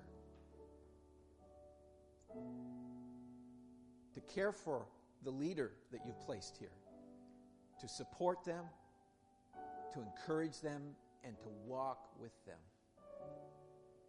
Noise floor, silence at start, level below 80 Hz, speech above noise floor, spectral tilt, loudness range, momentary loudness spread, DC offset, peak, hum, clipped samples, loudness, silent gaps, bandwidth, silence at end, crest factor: -72 dBFS; 0 s; -76 dBFS; 26 dB; -5.5 dB/octave; 11 LU; 23 LU; under 0.1%; -24 dBFS; none; under 0.1%; -48 LUFS; none; 11.5 kHz; 0 s; 24 dB